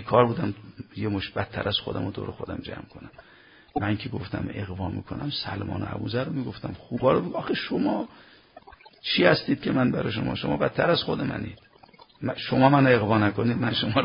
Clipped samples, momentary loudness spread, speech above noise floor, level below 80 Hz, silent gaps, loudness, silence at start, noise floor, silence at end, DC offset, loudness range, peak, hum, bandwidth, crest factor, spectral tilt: under 0.1%; 15 LU; 28 dB; -50 dBFS; none; -26 LUFS; 0 s; -53 dBFS; 0 s; under 0.1%; 8 LU; -4 dBFS; none; 5.4 kHz; 22 dB; -10.5 dB/octave